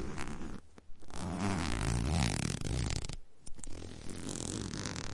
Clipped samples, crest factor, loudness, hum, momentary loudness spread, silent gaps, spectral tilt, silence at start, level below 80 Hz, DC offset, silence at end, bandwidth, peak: under 0.1%; 24 dB; -37 LUFS; none; 17 LU; none; -4.5 dB/octave; 0 s; -44 dBFS; under 0.1%; 0 s; 11.5 kHz; -12 dBFS